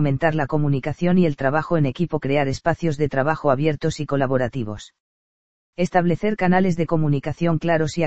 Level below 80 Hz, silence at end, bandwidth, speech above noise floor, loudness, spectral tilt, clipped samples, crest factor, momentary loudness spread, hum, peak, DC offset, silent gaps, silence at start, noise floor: -46 dBFS; 0 s; 8.2 kHz; over 70 dB; -21 LUFS; -7.5 dB/octave; under 0.1%; 18 dB; 6 LU; none; -2 dBFS; 2%; 5.00-5.73 s; 0 s; under -90 dBFS